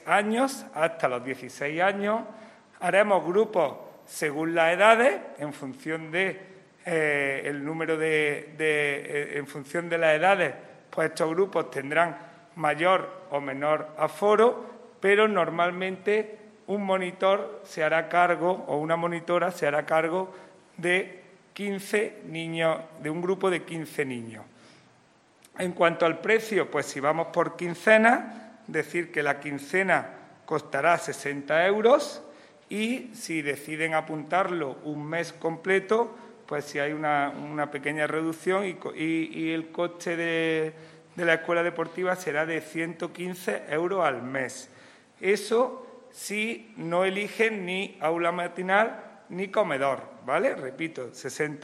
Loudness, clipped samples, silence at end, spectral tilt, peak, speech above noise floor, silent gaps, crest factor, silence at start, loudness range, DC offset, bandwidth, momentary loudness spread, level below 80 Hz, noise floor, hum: -27 LUFS; under 0.1%; 0 s; -4.5 dB/octave; -2 dBFS; 34 dB; none; 24 dB; 0.05 s; 5 LU; under 0.1%; 16 kHz; 12 LU; -82 dBFS; -60 dBFS; none